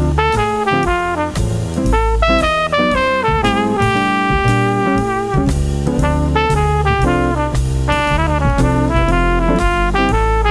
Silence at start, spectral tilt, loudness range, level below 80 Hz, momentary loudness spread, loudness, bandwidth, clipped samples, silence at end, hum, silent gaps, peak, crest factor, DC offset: 0 s; -6 dB/octave; 1 LU; -20 dBFS; 3 LU; -15 LUFS; 11 kHz; under 0.1%; 0 s; none; none; 0 dBFS; 14 dB; 0.4%